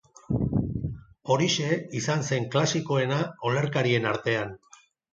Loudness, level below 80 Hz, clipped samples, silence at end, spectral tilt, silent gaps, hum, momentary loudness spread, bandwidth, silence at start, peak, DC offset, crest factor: -26 LUFS; -48 dBFS; under 0.1%; 0.55 s; -5 dB/octave; none; none; 8 LU; 7.8 kHz; 0.3 s; -10 dBFS; under 0.1%; 16 dB